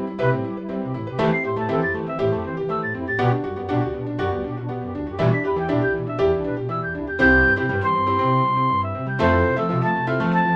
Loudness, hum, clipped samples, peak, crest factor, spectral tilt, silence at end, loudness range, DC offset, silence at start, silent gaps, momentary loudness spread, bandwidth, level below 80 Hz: -22 LUFS; none; under 0.1%; -4 dBFS; 16 dB; -8.5 dB/octave; 0 s; 5 LU; under 0.1%; 0 s; none; 9 LU; 7 kHz; -40 dBFS